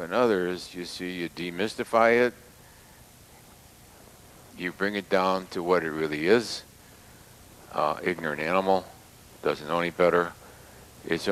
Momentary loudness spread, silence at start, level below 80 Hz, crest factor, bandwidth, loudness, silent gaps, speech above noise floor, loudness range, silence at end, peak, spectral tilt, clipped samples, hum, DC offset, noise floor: 12 LU; 0 s; -60 dBFS; 22 dB; 15.5 kHz; -27 LUFS; none; 26 dB; 3 LU; 0 s; -6 dBFS; -5 dB/octave; under 0.1%; none; under 0.1%; -52 dBFS